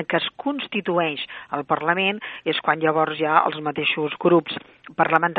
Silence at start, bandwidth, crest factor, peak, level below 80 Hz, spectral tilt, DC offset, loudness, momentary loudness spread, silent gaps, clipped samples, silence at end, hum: 0 s; 4.8 kHz; 20 dB; -2 dBFS; -68 dBFS; -8 dB/octave; under 0.1%; -22 LUFS; 10 LU; none; under 0.1%; 0 s; none